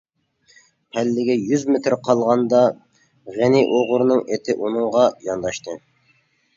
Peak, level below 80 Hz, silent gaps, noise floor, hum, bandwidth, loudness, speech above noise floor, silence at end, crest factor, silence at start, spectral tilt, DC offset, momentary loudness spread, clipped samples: -2 dBFS; -62 dBFS; none; -62 dBFS; none; 7.6 kHz; -19 LUFS; 43 dB; 0.8 s; 18 dB; 0.95 s; -6 dB/octave; under 0.1%; 13 LU; under 0.1%